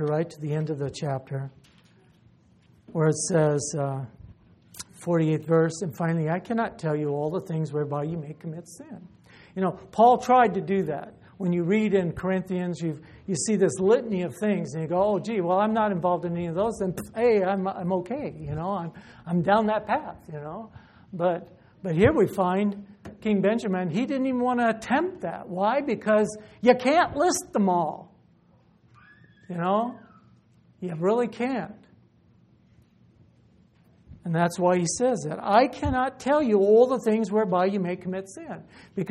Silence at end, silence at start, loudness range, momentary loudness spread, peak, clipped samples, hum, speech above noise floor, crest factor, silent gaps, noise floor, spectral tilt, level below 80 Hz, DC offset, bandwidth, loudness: 0 s; 0 s; 7 LU; 16 LU; -4 dBFS; under 0.1%; none; 35 dB; 20 dB; none; -60 dBFS; -6 dB/octave; -56 dBFS; under 0.1%; 13 kHz; -25 LUFS